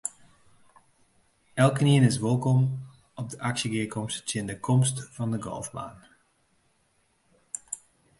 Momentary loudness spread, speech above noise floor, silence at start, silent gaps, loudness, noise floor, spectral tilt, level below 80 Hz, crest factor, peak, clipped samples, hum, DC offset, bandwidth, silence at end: 18 LU; 43 dB; 0.05 s; none; -27 LUFS; -69 dBFS; -5.5 dB/octave; -62 dBFS; 20 dB; -8 dBFS; under 0.1%; none; under 0.1%; 11.5 kHz; 0.45 s